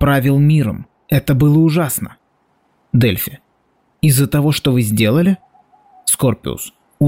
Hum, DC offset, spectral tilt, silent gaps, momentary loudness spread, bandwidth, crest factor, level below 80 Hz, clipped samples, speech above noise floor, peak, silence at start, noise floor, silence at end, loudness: none; under 0.1%; -5.5 dB/octave; none; 12 LU; 16.5 kHz; 12 dB; -40 dBFS; under 0.1%; 47 dB; -4 dBFS; 0 s; -60 dBFS; 0 s; -15 LUFS